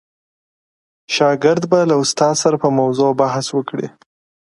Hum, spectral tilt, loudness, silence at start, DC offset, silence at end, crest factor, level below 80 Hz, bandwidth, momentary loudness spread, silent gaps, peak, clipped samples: none; -4.5 dB/octave; -16 LUFS; 1.1 s; under 0.1%; 0.6 s; 16 dB; -64 dBFS; 11.5 kHz; 8 LU; none; 0 dBFS; under 0.1%